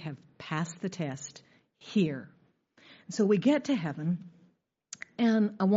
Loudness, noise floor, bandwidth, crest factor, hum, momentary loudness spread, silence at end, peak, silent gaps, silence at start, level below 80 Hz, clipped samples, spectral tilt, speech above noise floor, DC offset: -30 LUFS; -67 dBFS; 7.6 kHz; 16 dB; none; 17 LU; 0 s; -14 dBFS; none; 0 s; -76 dBFS; under 0.1%; -6.5 dB/octave; 39 dB; under 0.1%